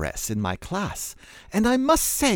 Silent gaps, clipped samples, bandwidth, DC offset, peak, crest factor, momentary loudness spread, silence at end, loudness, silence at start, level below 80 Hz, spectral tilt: none; under 0.1%; over 20 kHz; under 0.1%; -6 dBFS; 18 dB; 14 LU; 0 s; -24 LUFS; 0 s; -42 dBFS; -3.5 dB/octave